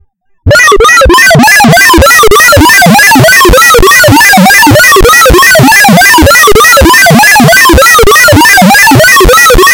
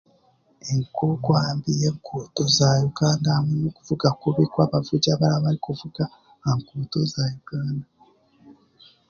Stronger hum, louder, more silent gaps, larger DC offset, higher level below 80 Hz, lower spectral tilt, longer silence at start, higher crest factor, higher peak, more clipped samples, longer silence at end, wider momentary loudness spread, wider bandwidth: neither; first, 0 LUFS vs -23 LUFS; neither; neither; first, -14 dBFS vs -54 dBFS; second, -3 dB/octave vs -6 dB/octave; second, 0.45 s vs 0.65 s; second, 2 dB vs 20 dB; first, 0 dBFS vs -4 dBFS; first, 30% vs under 0.1%; second, 0 s vs 0.6 s; second, 1 LU vs 10 LU; first, over 20 kHz vs 7.2 kHz